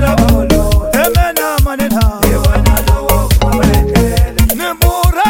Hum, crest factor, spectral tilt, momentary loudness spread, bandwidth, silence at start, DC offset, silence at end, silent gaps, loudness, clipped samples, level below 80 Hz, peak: none; 10 dB; -5.5 dB/octave; 2 LU; 17.5 kHz; 0 s; under 0.1%; 0 s; none; -12 LUFS; under 0.1%; -14 dBFS; 0 dBFS